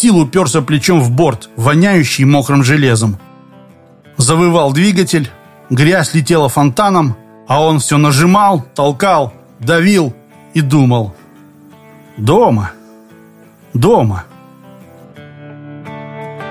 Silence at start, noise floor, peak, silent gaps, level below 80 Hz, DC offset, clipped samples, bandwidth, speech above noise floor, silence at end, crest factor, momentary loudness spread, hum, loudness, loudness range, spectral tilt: 0 s; -41 dBFS; 0 dBFS; none; -42 dBFS; under 0.1%; under 0.1%; 15.5 kHz; 31 dB; 0 s; 12 dB; 15 LU; none; -11 LUFS; 5 LU; -5.5 dB/octave